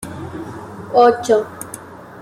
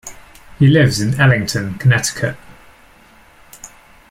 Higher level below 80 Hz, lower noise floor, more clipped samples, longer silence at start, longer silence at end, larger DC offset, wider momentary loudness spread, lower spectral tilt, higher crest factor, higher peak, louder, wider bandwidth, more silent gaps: second, -56 dBFS vs -44 dBFS; second, -35 dBFS vs -46 dBFS; neither; about the same, 0 s vs 0.05 s; second, 0 s vs 0.45 s; neither; second, 20 LU vs 25 LU; about the same, -5 dB/octave vs -5.5 dB/octave; about the same, 18 dB vs 16 dB; about the same, -2 dBFS vs 0 dBFS; about the same, -15 LUFS vs -15 LUFS; about the same, 15.5 kHz vs 15.5 kHz; neither